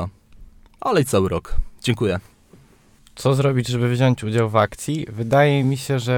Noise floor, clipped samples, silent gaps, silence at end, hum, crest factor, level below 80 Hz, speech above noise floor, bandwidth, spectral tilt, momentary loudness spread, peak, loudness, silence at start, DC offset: -52 dBFS; under 0.1%; none; 0 s; none; 18 dB; -34 dBFS; 33 dB; 17 kHz; -6 dB/octave; 10 LU; -4 dBFS; -20 LUFS; 0 s; under 0.1%